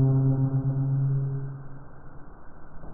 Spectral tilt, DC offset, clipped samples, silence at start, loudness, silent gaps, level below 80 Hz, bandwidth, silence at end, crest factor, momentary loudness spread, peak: -12 dB/octave; under 0.1%; under 0.1%; 0 s; -26 LUFS; none; -46 dBFS; 1.7 kHz; 0 s; 14 dB; 24 LU; -14 dBFS